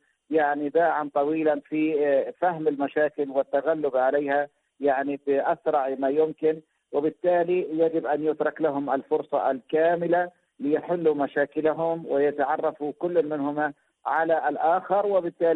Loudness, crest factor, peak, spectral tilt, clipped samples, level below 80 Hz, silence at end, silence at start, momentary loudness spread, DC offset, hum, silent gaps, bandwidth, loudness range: -25 LUFS; 12 dB; -12 dBFS; -9 dB/octave; under 0.1%; -72 dBFS; 0 s; 0.3 s; 5 LU; under 0.1%; none; none; 4.1 kHz; 1 LU